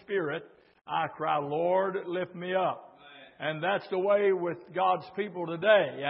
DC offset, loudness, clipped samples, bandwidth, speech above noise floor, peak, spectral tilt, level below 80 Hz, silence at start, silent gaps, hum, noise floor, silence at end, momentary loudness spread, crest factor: under 0.1%; -29 LUFS; under 0.1%; 5.6 kHz; 24 dB; -8 dBFS; -9.5 dB/octave; -80 dBFS; 0.1 s; none; none; -53 dBFS; 0 s; 10 LU; 20 dB